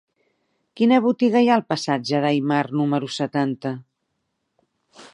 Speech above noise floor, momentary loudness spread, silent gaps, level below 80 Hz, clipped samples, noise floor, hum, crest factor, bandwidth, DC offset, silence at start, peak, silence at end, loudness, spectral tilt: 55 dB; 8 LU; none; -72 dBFS; under 0.1%; -75 dBFS; none; 18 dB; 10.5 kHz; under 0.1%; 0.75 s; -4 dBFS; 0.1 s; -21 LUFS; -6 dB/octave